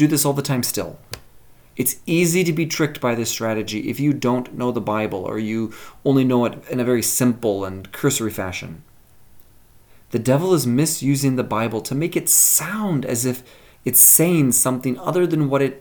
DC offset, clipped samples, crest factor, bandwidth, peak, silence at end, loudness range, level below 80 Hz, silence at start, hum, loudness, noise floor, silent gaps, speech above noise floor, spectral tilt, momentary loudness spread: under 0.1%; under 0.1%; 20 dB; 19.5 kHz; 0 dBFS; 0 s; 8 LU; -54 dBFS; 0 s; none; -18 LUFS; -49 dBFS; none; 30 dB; -4.5 dB/octave; 14 LU